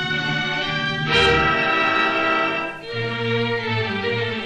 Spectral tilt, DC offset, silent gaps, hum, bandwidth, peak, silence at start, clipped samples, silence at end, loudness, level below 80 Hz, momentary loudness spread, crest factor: -5 dB/octave; under 0.1%; none; none; 10.5 kHz; -4 dBFS; 0 s; under 0.1%; 0 s; -20 LUFS; -42 dBFS; 8 LU; 16 dB